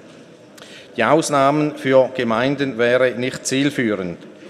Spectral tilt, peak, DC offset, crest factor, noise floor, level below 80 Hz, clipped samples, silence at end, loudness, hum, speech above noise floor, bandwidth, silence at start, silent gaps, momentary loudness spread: -5 dB/octave; 0 dBFS; under 0.1%; 18 dB; -43 dBFS; -62 dBFS; under 0.1%; 0 s; -18 LUFS; none; 25 dB; 14 kHz; 0.05 s; none; 9 LU